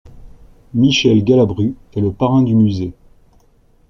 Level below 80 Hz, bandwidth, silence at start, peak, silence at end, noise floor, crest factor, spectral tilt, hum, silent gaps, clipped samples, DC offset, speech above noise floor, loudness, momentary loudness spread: -42 dBFS; 7.2 kHz; 0.05 s; -2 dBFS; 0.95 s; -52 dBFS; 14 dB; -6.5 dB/octave; none; none; under 0.1%; under 0.1%; 38 dB; -15 LUFS; 11 LU